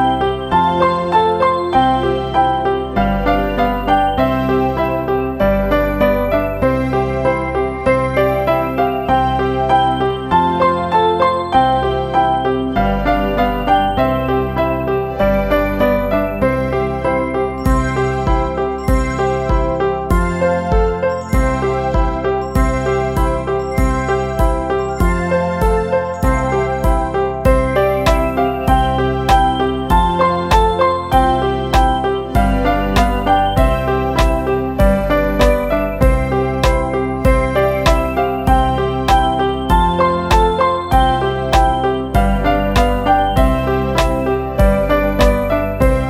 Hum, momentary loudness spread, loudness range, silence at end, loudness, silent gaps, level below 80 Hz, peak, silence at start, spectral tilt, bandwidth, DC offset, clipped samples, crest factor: none; 4 LU; 2 LU; 0 s; -15 LUFS; none; -22 dBFS; 0 dBFS; 0 s; -6.5 dB/octave; 15 kHz; under 0.1%; under 0.1%; 14 dB